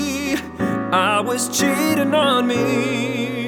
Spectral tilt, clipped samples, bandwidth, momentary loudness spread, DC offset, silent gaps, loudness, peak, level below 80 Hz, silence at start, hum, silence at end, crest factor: -4 dB/octave; under 0.1%; over 20 kHz; 6 LU; under 0.1%; none; -19 LUFS; -2 dBFS; -52 dBFS; 0 s; none; 0 s; 16 dB